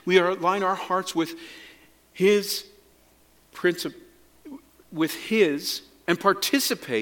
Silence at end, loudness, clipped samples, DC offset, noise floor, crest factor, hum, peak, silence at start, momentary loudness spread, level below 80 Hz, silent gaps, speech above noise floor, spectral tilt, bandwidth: 0 s; -24 LUFS; under 0.1%; under 0.1%; -59 dBFS; 22 dB; none; -4 dBFS; 0.05 s; 19 LU; -68 dBFS; none; 35 dB; -3.5 dB/octave; 17.5 kHz